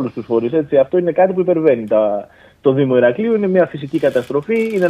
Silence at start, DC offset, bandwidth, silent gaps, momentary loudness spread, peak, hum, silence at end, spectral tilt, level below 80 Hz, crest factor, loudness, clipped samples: 0 s; under 0.1%; 10.5 kHz; none; 5 LU; 0 dBFS; none; 0 s; -8.5 dB/octave; -56 dBFS; 14 dB; -16 LUFS; under 0.1%